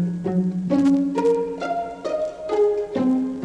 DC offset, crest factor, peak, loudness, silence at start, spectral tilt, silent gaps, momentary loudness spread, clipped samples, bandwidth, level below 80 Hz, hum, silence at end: under 0.1%; 12 dB; -10 dBFS; -22 LUFS; 0 s; -8.5 dB/octave; none; 8 LU; under 0.1%; 9.4 kHz; -56 dBFS; none; 0 s